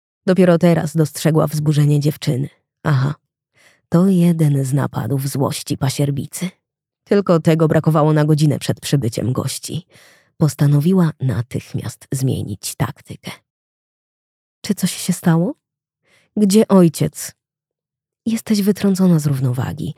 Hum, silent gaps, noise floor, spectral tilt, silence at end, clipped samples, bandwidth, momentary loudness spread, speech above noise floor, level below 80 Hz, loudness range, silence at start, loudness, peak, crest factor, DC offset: none; 13.50-14.62 s; -86 dBFS; -6.5 dB/octave; 0.05 s; under 0.1%; 16 kHz; 13 LU; 70 dB; -54 dBFS; 6 LU; 0.25 s; -17 LUFS; -2 dBFS; 16 dB; under 0.1%